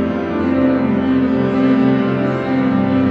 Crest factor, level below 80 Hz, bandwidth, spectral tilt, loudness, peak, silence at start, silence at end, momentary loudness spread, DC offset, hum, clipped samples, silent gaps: 12 dB; -50 dBFS; 5.4 kHz; -9 dB/octave; -16 LUFS; -4 dBFS; 0 s; 0 s; 4 LU; under 0.1%; none; under 0.1%; none